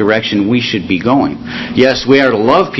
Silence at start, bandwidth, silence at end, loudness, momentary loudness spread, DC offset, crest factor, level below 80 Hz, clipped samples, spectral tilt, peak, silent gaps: 0 s; 8 kHz; 0 s; -12 LUFS; 8 LU; under 0.1%; 12 dB; -42 dBFS; 0.4%; -6 dB/octave; 0 dBFS; none